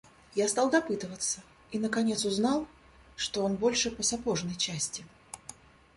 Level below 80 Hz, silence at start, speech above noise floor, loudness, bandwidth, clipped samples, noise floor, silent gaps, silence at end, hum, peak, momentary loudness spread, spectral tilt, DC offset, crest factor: -60 dBFS; 0.35 s; 22 dB; -30 LUFS; 11.5 kHz; under 0.1%; -52 dBFS; none; 0.45 s; none; -12 dBFS; 18 LU; -3 dB/octave; under 0.1%; 20 dB